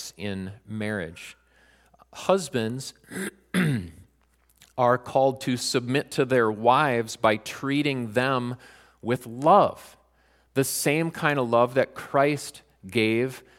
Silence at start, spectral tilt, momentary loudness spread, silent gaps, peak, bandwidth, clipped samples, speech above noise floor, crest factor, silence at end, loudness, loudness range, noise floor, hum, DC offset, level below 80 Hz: 0 s; -5 dB/octave; 15 LU; none; -4 dBFS; 17 kHz; under 0.1%; 40 dB; 20 dB; 0.2 s; -25 LUFS; 6 LU; -64 dBFS; none; under 0.1%; -64 dBFS